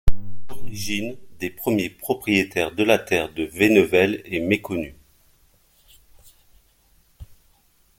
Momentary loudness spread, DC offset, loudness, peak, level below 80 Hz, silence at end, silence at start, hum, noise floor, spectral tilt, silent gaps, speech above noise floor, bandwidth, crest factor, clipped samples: 17 LU; under 0.1%; -22 LUFS; -2 dBFS; -36 dBFS; 0.75 s; 0.05 s; none; -60 dBFS; -5 dB/octave; none; 38 dB; 17 kHz; 20 dB; under 0.1%